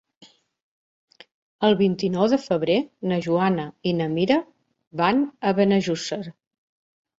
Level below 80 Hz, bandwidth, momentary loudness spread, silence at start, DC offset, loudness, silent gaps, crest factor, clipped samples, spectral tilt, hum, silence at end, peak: -64 dBFS; 8 kHz; 7 LU; 1.6 s; under 0.1%; -22 LUFS; 4.87-4.91 s; 18 dB; under 0.1%; -6.5 dB/octave; none; 0.85 s; -6 dBFS